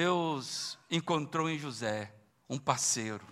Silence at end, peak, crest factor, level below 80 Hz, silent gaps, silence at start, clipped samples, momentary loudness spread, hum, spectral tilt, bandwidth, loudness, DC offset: 0 s; -12 dBFS; 22 dB; -76 dBFS; none; 0 s; under 0.1%; 8 LU; none; -3.5 dB/octave; 15.5 kHz; -33 LUFS; under 0.1%